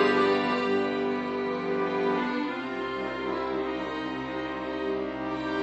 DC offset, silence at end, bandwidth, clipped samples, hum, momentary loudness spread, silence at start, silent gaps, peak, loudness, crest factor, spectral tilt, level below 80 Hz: under 0.1%; 0 s; 8.2 kHz; under 0.1%; none; 7 LU; 0 s; none; -10 dBFS; -29 LUFS; 18 dB; -6 dB/octave; -58 dBFS